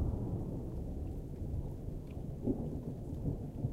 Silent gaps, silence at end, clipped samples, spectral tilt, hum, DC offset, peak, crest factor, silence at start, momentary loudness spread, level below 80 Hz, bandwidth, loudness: none; 0 s; under 0.1%; -10 dB/octave; none; under 0.1%; -22 dBFS; 16 dB; 0 s; 6 LU; -44 dBFS; 15.5 kHz; -41 LUFS